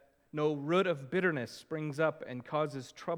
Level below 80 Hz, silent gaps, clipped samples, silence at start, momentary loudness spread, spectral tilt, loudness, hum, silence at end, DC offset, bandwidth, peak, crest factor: -78 dBFS; none; under 0.1%; 0.35 s; 10 LU; -6.5 dB/octave; -34 LUFS; none; 0 s; under 0.1%; 15.5 kHz; -16 dBFS; 18 dB